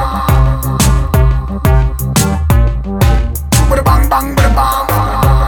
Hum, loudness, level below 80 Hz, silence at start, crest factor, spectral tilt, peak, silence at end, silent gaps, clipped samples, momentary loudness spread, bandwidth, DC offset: none; -12 LUFS; -14 dBFS; 0 s; 10 dB; -5.5 dB/octave; 0 dBFS; 0 s; none; under 0.1%; 3 LU; 19.5 kHz; under 0.1%